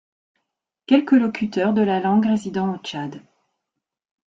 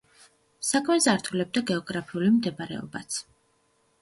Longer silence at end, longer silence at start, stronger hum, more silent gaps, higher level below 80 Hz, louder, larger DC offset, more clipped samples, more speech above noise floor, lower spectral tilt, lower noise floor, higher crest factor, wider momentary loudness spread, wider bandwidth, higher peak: first, 1.2 s vs 0.8 s; first, 0.9 s vs 0.6 s; neither; neither; about the same, -64 dBFS vs -66 dBFS; first, -20 LUFS vs -26 LUFS; neither; neither; first, 63 dB vs 42 dB; first, -7 dB/octave vs -4 dB/octave; first, -83 dBFS vs -68 dBFS; about the same, 18 dB vs 20 dB; about the same, 13 LU vs 12 LU; second, 7.8 kHz vs 11.5 kHz; first, -4 dBFS vs -8 dBFS